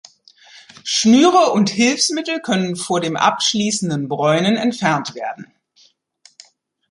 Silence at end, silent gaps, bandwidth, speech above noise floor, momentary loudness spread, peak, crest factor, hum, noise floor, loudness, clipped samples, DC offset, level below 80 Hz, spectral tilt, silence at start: 1.45 s; none; 11.5 kHz; 39 dB; 11 LU; -2 dBFS; 16 dB; none; -56 dBFS; -16 LUFS; under 0.1%; under 0.1%; -64 dBFS; -4 dB/octave; 0.55 s